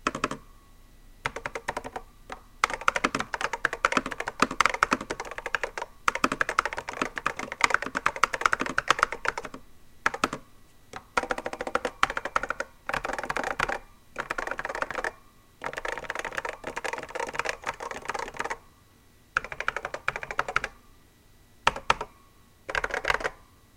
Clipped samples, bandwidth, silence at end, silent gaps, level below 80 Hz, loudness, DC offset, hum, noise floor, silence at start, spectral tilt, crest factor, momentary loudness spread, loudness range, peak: under 0.1%; 17 kHz; 0.35 s; none; -50 dBFS; -29 LUFS; under 0.1%; none; -57 dBFS; 0 s; -2.5 dB/octave; 30 dB; 12 LU; 6 LU; 0 dBFS